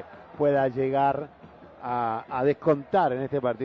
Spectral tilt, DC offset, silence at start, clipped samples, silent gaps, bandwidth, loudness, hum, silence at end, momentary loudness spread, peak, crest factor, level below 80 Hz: -9 dB/octave; under 0.1%; 0 s; under 0.1%; none; 6 kHz; -26 LUFS; none; 0 s; 10 LU; -10 dBFS; 16 dB; -62 dBFS